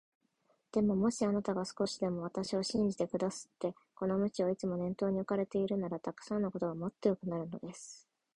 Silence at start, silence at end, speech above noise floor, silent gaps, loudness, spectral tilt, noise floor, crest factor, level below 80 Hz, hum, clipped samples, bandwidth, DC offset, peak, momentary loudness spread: 0.75 s; 0.4 s; 41 dB; none; -35 LUFS; -6 dB/octave; -76 dBFS; 20 dB; -68 dBFS; none; under 0.1%; 11.5 kHz; under 0.1%; -16 dBFS; 9 LU